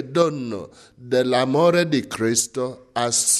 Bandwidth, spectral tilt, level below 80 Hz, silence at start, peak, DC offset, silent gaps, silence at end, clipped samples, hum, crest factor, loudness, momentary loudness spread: 14.5 kHz; -3.5 dB/octave; -62 dBFS; 0 s; -6 dBFS; under 0.1%; none; 0 s; under 0.1%; none; 16 dB; -21 LUFS; 11 LU